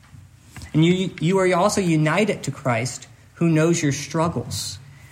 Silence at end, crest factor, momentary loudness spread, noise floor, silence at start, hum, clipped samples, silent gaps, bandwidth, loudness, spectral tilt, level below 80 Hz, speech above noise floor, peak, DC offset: 0.05 s; 16 dB; 11 LU; -46 dBFS; 0.15 s; none; under 0.1%; none; 16 kHz; -21 LUFS; -5.5 dB/octave; -56 dBFS; 26 dB; -6 dBFS; under 0.1%